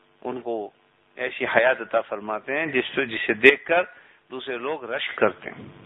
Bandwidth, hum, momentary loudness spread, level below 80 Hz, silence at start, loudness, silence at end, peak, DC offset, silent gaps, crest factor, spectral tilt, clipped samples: 11 kHz; none; 18 LU; -66 dBFS; 0.25 s; -23 LUFS; 0.05 s; 0 dBFS; under 0.1%; none; 24 dB; -6 dB/octave; under 0.1%